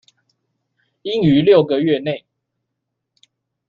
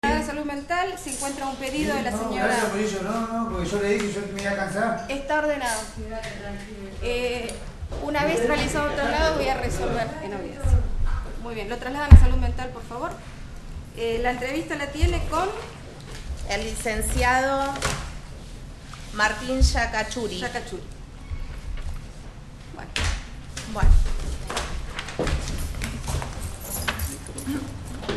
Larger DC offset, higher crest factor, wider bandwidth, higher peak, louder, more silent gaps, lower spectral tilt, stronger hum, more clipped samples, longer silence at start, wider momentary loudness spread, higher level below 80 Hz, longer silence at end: neither; second, 18 dB vs 24 dB; second, 6.8 kHz vs 12.5 kHz; about the same, -2 dBFS vs 0 dBFS; first, -16 LUFS vs -26 LUFS; neither; first, -8.5 dB/octave vs -5 dB/octave; neither; neither; first, 1.05 s vs 0.05 s; about the same, 16 LU vs 15 LU; second, -56 dBFS vs -28 dBFS; first, 1.5 s vs 0 s